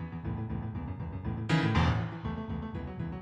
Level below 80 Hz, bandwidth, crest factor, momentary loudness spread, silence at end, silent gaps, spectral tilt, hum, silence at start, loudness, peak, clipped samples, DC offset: -42 dBFS; 9.4 kHz; 18 dB; 11 LU; 0 s; none; -7 dB/octave; none; 0 s; -33 LUFS; -16 dBFS; under 0.1%; under 0.1%